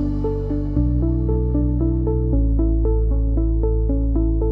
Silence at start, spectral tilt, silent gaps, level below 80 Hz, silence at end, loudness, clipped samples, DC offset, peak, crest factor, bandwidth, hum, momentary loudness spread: 0 s; -13 dB/octave; none; -20 dBFS; 0 s; -21 LUFS; under 0.1%; under 0.1%; -6 dBFS; 12 dB; 1.8 kHz; none; 3 LU